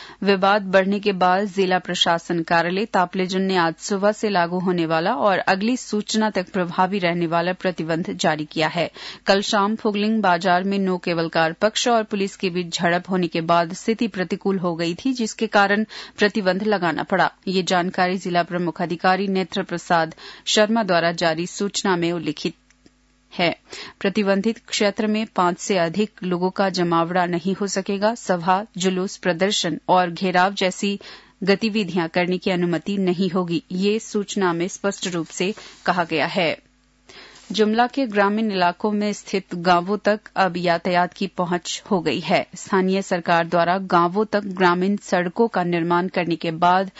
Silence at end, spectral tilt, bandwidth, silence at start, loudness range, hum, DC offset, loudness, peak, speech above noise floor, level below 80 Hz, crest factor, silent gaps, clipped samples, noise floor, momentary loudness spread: 0.1 s; -4.5 dB/octave; 8 kHz; 0 s; 3 LU; none; under 0.1%; -21 LUFS; -4 dBFS; 36 dB; -62 dBFS; 18 dB; none; under 0.1%; -57 dBFS; 6 LU